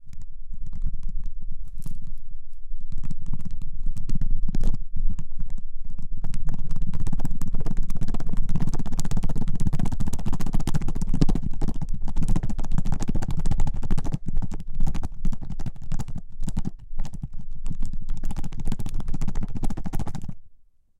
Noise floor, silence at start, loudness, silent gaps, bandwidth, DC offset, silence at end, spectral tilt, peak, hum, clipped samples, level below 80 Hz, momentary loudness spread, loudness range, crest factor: -50 dBFS; 0 s; -32 LUFS; none; 7.6 kHz; under 0.1%; 0.45 s; -7 dB/octave; -4 dBFS; none; under 0.1%; -24 dBFS; 11 LU; 7 LU; 14 dB